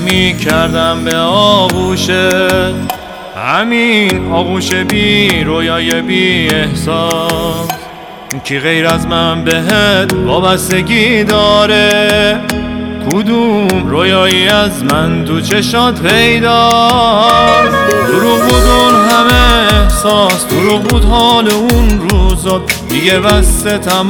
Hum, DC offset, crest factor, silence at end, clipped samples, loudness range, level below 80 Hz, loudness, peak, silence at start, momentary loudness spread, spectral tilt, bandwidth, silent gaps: none; under 0.1%; 10 dB; 0 s; under 0.1%; 5 LU; -20 dBFS; -9 LUFS; 0 dBFS; 0 s; 7 LU; -4 dB/octave; over 20 kHz; none